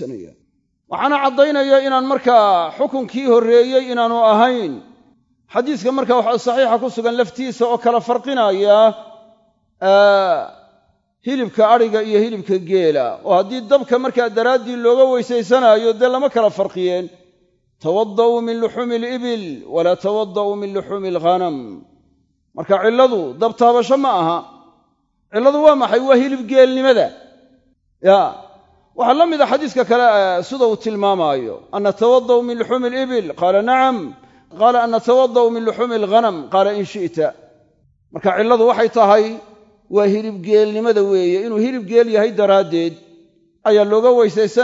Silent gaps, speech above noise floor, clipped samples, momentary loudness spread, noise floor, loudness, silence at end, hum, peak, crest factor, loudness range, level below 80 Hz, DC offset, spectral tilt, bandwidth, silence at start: none; 48 dB; under 0.1%; 10 LU; -63 dBFS; -15 LUFS; 0 s; none; 0 dBFS; 16 dB; 4 LU; -66 dBFS; under 0.1%; -5.5 dB/octave; 7.8 kHz; 0 s